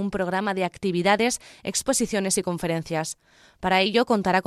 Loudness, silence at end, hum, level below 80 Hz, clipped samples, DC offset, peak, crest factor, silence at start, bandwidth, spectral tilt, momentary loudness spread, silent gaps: -24 LUFS; 0.05 s; none; -54 dBFS; under 0.1%; under 0.1%; -6 dBFS; 18 dB; 0 s; 15.5 kHz; -3.5 dB/octave; 8 LU; none